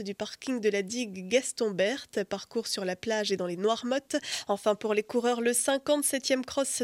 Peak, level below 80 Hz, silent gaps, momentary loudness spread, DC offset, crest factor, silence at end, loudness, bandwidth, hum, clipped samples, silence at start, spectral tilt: -12 dBFS; -72 dBFS; none; 7 LU; under 0.1%; 18 dB; 0 s; -29 LUFS; 16.5 kHz; none; under 0.1%; 0 s; -3 dB/octave